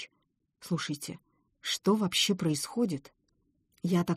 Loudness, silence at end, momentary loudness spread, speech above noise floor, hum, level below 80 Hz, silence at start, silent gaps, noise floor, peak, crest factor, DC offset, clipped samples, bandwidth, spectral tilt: -31 LUFS; 0 s; 16 LU; 47 dB; none; -70 dBFS; 0 s; none; -77 dBFS; -14 dBFS; 18 dB; under 0.1%; under 0.1%; 15.5 kHz; -4.5 dB/octave